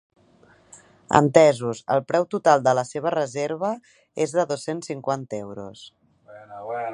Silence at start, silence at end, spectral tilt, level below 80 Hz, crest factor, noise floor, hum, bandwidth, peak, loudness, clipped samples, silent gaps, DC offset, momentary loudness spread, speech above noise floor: 1.1 s; 0 s; -5.5 dB/octave; -64 dBFS; 24 dB; -56 dBFS; none; 11 kHz; 0 dBFS; -22 LUFS; under 0.1%; none; under 0.1%; 19 LU; 34 dB